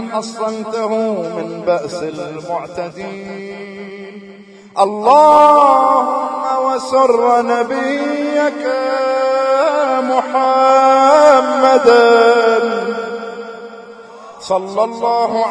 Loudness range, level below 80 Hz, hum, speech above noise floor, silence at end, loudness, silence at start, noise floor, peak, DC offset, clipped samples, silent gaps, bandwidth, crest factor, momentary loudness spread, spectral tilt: 11 LU; -62 dBFS; none; 22 dB; 0 s; -13 LUFS; 0 s; -35 dBFS; 0 dBFS; under 0.1%; under 0.1%; none; 10.5 kHz; 14 dB; 19 LU; -4.5 dB/octave